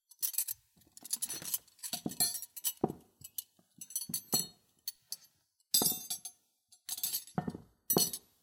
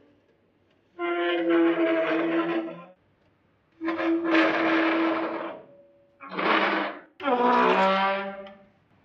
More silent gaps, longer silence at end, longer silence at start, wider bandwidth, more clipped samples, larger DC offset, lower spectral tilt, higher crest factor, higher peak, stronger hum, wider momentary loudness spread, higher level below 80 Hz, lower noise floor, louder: neither; second, 0.25 s vs 0.5 s; second, 0.2 s vs 1 s; first, 17 kHz vs 6.4 kHz; neither; neither; second, -2 dB/octave vs -6 dB/octave; first, 28 dB vs 18 dB; second, -12 dBFS vs -8 dBFS; neither; about the same, 17 LU vs 15 LU; about the same, -76 dBFS vs -76 dBFS; first, -70 dBFS vs -65 dBFS; second, -35 LUFS vs -24 LUFS